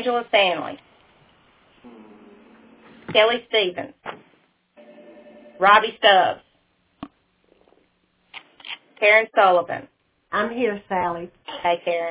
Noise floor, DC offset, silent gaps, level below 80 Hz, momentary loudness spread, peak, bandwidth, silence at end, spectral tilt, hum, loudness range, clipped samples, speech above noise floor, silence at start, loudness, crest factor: -65 dBFS; under 0.1%; none; -64 dBFS; 27 LU; -2 dBFS; 4 kHz; 0 s; -6.5 dB/octave; none; 4 LU; under 0.1%; 46 dB; 0 s; -19 LUFS; 22 dB